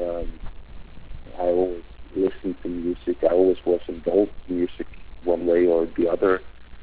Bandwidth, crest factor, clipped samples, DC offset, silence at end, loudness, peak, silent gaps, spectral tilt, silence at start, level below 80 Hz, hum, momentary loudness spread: 4 kHz; 18 dB; under 0.1%; under 0.1%; 0 s; -23 LUFS; -6 dBFS; none; -11 dB/octave; 0 s; -44 dBFS; none; 18 LU